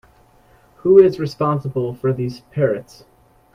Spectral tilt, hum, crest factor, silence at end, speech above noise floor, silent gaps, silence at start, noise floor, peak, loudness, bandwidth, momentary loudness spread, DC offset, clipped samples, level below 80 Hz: -8.5 dB/octave; none; 18 dB; 0.75 s; 35 dB; none; 0.85 s; -52 dBFS; 0 dBFS; -18 LUFS; 6.6 kHz; 13 LU; under 0.1%; under 0.1%; -54 dBFS